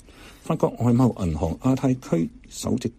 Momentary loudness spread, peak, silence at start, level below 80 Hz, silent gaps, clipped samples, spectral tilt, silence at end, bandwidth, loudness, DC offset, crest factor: 10 LU; -8 dBFS; 0.2 s; -42 dBFS; none; under 0.1%; -7.5 dB/octave; 0.05 s; 15.5 kHz; -24 LUFS; under 0.1%; 16 dB